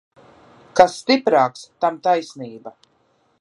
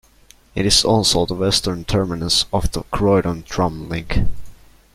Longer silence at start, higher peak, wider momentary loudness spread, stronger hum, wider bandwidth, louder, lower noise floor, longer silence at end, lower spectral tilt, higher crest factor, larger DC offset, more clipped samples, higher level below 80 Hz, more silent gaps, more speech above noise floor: first, 0.75 s vs 0.55 s; about the same, 0 dBFS vs 0 dBFS; first, 19 LU vs 9 LU; neither; second, 11.5 kHz vs 15.5 kHz; about the same, -18 LUFS vs -18 LUFS; first, -62 dBFS vs -50 dBFS; first, 0.7 s vs 0.4 s; about the same, -4 dB/octave vs -4 dB/octave; about the same, 20 dB vs 18 dB; neither; neither; second, -62 dBFS vs -30 dBFS; neither; first, 44 dB vs 32 dB